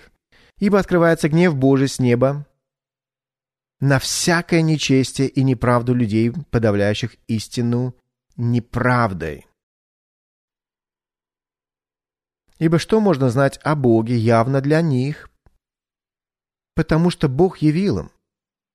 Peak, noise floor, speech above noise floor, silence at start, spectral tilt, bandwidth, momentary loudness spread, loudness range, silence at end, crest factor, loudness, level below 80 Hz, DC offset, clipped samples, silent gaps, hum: -4 dBFS; under -90 dBFS; over 73 dB; 0.6 s; -6 dB/octave; 13.5 kHz; 9 LU; 7 LU; 0.7 s; 16 dB; -18 LUFS; -44 dBFS; under 0.1%; under 0.1%; 9.63-10.48 s; none